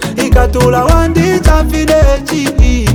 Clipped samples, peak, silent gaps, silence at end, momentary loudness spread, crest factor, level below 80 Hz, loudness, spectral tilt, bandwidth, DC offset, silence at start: 0.2%; 0 dBFS; none; 0 s; 2 LU; 8 dB; -12 dBFS; -10 LUFS; -6 dB/octave; 18 kHz; under 0.1%; 0 s